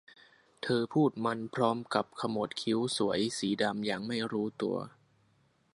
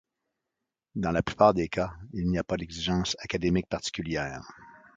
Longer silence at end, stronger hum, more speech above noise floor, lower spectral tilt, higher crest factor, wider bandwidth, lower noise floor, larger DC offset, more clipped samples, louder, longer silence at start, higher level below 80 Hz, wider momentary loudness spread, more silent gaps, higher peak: first, 0.85 s vs 0.25 s; neither; second, 38 dB vs 58 dB; about the same, -5 dB/octave vs -5.5 dB/octave; about the same, 22 dB vs 24 dB; first, 11.5 kHz vs 9 kHz; second, -70 dBFS vs -86 dBFS; neither; neither; second, -32 LUFS vs -28 LUFS; second, 0.65 s vs 0.95 s; second, -72 dBFS vs -48 dBFS; second, 6 LU vs 12 LU; neither; second, -10 dBFS vs -6 dBFS